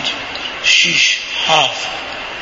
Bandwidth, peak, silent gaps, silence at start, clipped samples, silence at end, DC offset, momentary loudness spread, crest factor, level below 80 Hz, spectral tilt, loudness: 11 kHz; 0 dBFS; none; 0 s; under 0.1%; 0 s; under 0.1%; 13 LU; 16 dB; -50 dBFS; 0 dB/octave; -13 LUFS